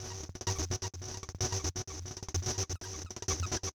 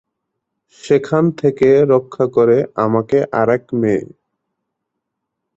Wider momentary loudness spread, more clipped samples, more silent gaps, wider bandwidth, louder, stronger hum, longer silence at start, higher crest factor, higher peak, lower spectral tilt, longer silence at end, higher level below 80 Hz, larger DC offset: first, 8 LU vs 5 LU; neither; neither; first, over 20 kHz vs 8 kHz; second, -36 LUFS vs -15 LUFS; neither; second, 0 s vs 0.85 s; about the same, 14 dB vs 14 dB; second, -22 dBFS vs -2 dBFS; second, -3 dB/octave vs -8 dB/octave; second, 0.05 s vs 1.5 s; first, -48 dBFS vs -54 dBFS; neither